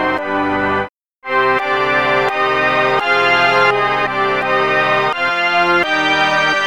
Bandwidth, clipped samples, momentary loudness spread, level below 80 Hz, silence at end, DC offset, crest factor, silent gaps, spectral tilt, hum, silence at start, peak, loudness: 16.5 kHz; under 0.1%; 6 LU; -50 dBFS; 0 s; 0.6%; 14 dB; 0.89-1.21 s; -4 dB/octave; none; 0 s; -2 dBFS; -14 LUFS